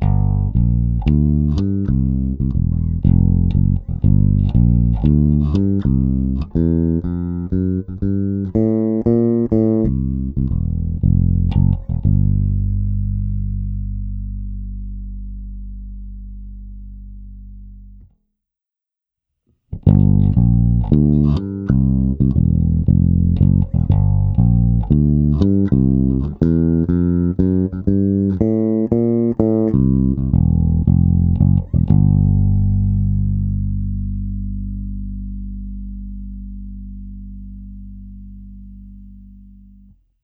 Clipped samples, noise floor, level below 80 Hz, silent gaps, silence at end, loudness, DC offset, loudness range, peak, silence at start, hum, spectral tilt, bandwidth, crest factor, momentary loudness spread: under 0.1%; -87 dBFS; -24 dBFS; none; 0.85 s; -17 LUFS; under 0.1%; 17 LU; 0 dBFS; 0 s; 50 Hz at -40 dBFS; -12.5 dB/octave; 4.8 kHz; 16 dB; 19 LU